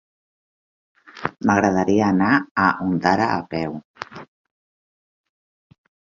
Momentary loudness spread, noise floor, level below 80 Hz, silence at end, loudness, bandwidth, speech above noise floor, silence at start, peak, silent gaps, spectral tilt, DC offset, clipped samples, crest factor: 16 LU; under -90 dBFS; -54 dBFS; 1.9 s; -20 LUFS; 7.4 kHz; over 71 dB; 1.15 s; -2 dBFS; 2.51-2.55 s, 3.85-3.94 s; -6.5 dB/octave; under 0.1%; under 0.1%; 22 dB